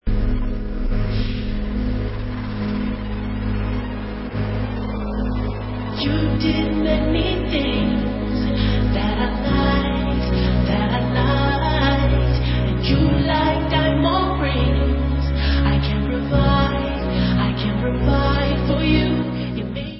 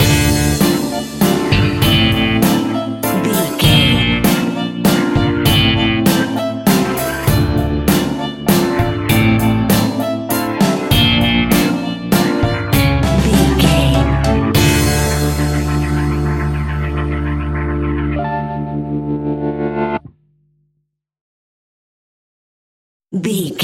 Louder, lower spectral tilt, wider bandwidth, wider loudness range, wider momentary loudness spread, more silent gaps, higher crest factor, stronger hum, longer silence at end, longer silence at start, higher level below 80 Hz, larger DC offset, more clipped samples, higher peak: second, -20 LUFS vs -15 LUFS; first, -11 dB/octave vs -5 dB/octave; second, 5.8 kHz vs 17 kHz; about the same, 7 LU vs 9 LU; about the same, 8 LU vs 8 LU; second, none vs 21.21-23.00 s; about the same, 14 dB vs 14 dB; neither; about the same, 0 s vs 0 s; about the same, 0.05 s vs 0 s; about the same, -24 dBFS vs -26 dBFS; neither; neither; second, -4 dBFS vs 0 dBFS